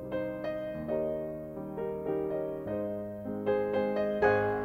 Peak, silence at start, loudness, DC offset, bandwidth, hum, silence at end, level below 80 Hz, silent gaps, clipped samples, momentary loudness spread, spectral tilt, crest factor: -12 dBFS; 0 s; -33 LUFS; under 0.1%; 16 kHz; none; 0 s; -58 dBFS; none; under 0.1%; 11 LU; -8.5 dB/octave; 20 dB